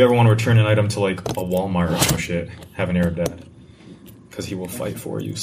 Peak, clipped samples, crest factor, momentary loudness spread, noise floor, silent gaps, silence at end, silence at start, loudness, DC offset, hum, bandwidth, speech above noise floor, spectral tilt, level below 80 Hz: -2 dBFS; under 0.1%; 18 dB; 14 LU; -43 dBFS; none; 0 s; 0 s; -20 LUFS; under 0.1%; none; 15.5 kHz; 24 dB; -5.5 dB/octave; -44 dBFS